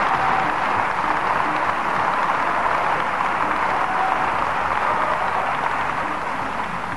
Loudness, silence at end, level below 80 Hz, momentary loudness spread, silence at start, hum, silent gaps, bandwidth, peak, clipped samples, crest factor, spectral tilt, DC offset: -21 LUFS; 0 s; -48 dBFS; 4 LU; 0 s; none; none; 11.5 kHz; -4 dBFS; under 0.1%; 16 dB; -4.5 dB/octave; 2%